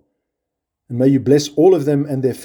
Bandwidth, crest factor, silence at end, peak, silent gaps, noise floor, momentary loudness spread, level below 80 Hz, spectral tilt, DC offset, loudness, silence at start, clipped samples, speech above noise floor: 18.5 kHz; 16 dB; 0 s; -2 dBFS; none; -80 dBFS; 7 LU; -60 dBFS; -7 dB/octave; under 0.1%; -15 LUFS; 0.9 s; under 0.1%; 65 dB